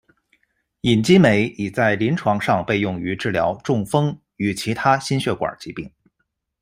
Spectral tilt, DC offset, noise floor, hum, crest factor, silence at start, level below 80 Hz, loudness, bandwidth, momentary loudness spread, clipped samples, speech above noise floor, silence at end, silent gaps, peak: -6 dB/octave; under 0.1%; -74 dBFS; none; 18 dB; 0.85 s; -52 dBFS; -20 LUFS; 15.5 kHz; 11 LU; under 0.1%; 55 dB; 0.75 s; none; -2 dBFS